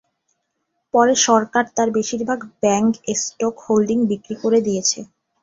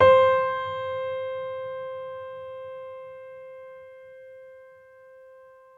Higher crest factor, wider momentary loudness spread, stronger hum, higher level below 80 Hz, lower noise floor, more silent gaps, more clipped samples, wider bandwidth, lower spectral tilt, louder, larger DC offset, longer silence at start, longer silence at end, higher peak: about the same, 18 dB vs 22 dB; second, 8 LU vs 24 LU; neither; about the same, -60 dBFS vs -64 dBFS; first, -74 dBFS vs -51 dBFS; neither; neither; first, 7.8 kHz vs 4.6 kHz; second, -3.5 dB/octave vs -6 dB/octave; first, -19 LUFS vs -27 LUFS; neither; first, 0.95 s vs 0 s; about the same, 0.4 s vs 0.5 s; first, -2 dBFS vs -6 dBFS